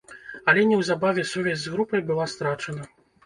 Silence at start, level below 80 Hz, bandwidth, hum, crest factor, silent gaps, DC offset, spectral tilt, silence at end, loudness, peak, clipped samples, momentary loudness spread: 0.1 s; -62 dBFS; 11.5 kHz; none; 20 dB; none; under 0.1%; -5 dB/octave; 0.4 s; -24 LUFS; -6 dBFS; under 0.1%; 13 LU